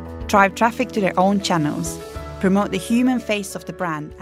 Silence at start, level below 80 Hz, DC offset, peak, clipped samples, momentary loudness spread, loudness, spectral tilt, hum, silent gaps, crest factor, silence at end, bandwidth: 0 s; -42 dBFS; under 0.1%; 0 dBFS; under 0.1%; 11 LU; -20 LUFS; -5 dB/octave; none; none; 20 dB; 0 s; 16 kHz